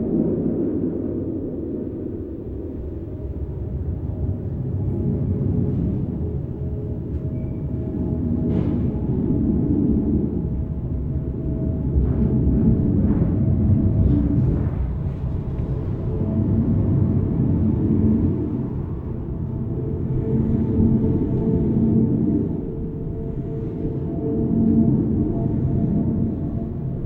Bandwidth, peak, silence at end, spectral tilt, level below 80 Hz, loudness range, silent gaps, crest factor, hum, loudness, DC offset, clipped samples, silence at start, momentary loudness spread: 3.2 kHz; -6 dBFS; 0 s; -13 dB/octave; -30 dBFS; 6 LU; none; 16 dB; none; -22 LUFS; under 0.1%; under 0.1%; 0 s; 10 LU